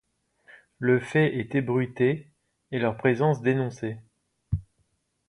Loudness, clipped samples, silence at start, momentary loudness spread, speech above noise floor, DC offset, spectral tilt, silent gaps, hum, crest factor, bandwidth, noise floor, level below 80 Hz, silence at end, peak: -26 LUFS; under 0.1%; 0.8 s; 11 LU; 47 dB; under 0.1%; -8 dB/octave; none; none; 20 dB; 11 kHz; -72 dBFS; -50 dBFS; 0.7 s; -6 dBFS